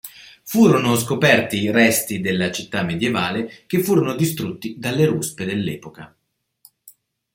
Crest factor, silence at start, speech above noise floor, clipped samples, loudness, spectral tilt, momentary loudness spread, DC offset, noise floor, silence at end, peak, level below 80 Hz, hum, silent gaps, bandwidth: 18 dB; 0.05 s; 36 dB; under 0.1%; -19 LUFS; -5 dB/octave; 12 LU; under 0.1%; -55 dBFS; 0.45 s; -2 dBFS; -58 dBFS; none; none; 16.5 kHz